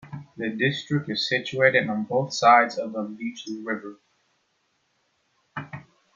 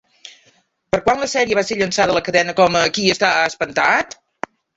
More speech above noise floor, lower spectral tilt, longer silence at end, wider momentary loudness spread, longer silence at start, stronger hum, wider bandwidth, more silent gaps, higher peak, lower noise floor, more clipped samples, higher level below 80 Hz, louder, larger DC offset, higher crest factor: first, 47 dB vs 41 dB; first, -5 dB/octave vs -3 dB/octave; second, 0.35 s vs 0.7 s; first, 21 LU vs 10 LU; second, 0.05 s vs 0.25 s; neither; about the same, 7.6 kHz vs 8 kHz; neither; second, -4 dBFS vs 0 dBFS; first, -71 dBFS vs -58 dBFS; neither; second, -70 dBFS vs -50 dBFS; second, -23 LUFS vs -16 LUFS; neither; about the same, 22 dB vs 18 dB